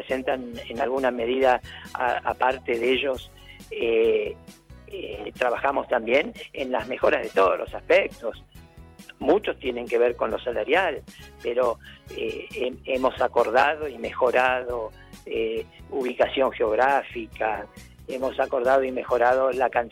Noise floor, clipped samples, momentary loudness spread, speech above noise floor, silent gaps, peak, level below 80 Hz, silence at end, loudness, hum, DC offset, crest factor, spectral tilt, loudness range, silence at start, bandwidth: -47 dBFS; under 0.1%; 14 LU; 23 dB; none; -8 dBFS; -52 dBFS; 0 s; -24 LUFS; none; under 0.1%; 18 dB; -5 dB/octave; 2 LU; 0 s; 16 kHz